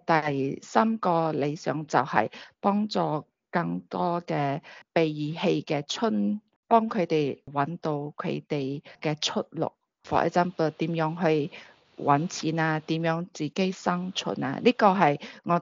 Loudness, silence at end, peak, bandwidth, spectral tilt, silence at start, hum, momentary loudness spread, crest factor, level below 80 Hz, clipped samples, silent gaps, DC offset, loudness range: -27 LUFS; 0 s; -4 dBFS; 7.4 kHz; -4.5 dB/octave; 0.1 s; none; 8 LU; 22 dB; -70 dBFS; under 0.1%; 6.56-6.63 s; under 0.1%; 3 LU